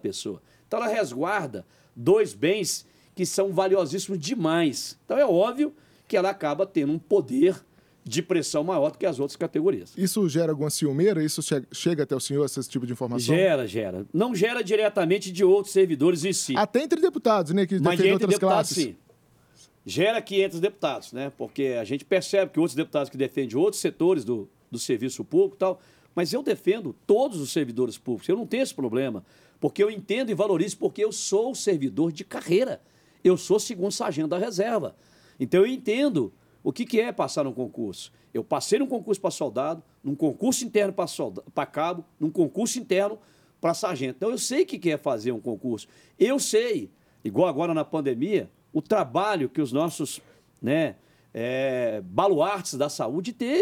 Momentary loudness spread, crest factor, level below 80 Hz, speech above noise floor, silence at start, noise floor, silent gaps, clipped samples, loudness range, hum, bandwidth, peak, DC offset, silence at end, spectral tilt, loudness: 10 LU; 18 dB; -72 dBFS; 35 dB; 0.05 s; -59 dBFS; none; under 0.1%; 4 LU; none; 16 kHz; -8 dBFS; under 0.1%; 0 s; -5 dB/octave; -25 LUFS